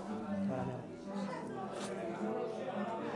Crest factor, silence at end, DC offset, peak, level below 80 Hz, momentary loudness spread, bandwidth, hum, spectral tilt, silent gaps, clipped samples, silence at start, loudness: 14 dB; 0 s; under 0.1%; -26 dBFS; -72 dBFS; 5 LU; 11.5 kHz; none; -6.5 dB/octave; none; under 0.1%; 0 s; -40 LUFS